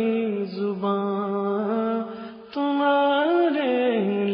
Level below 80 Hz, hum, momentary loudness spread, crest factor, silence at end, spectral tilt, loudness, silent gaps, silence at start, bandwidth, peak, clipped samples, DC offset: -74 dBFS; none; 8 LU; 12 dB; 0 s; -9.5 dB/octave; -23 LUFS; none; 0 s; 5.4 kHz; -10 dBFS; under 0.1%; under 0.1%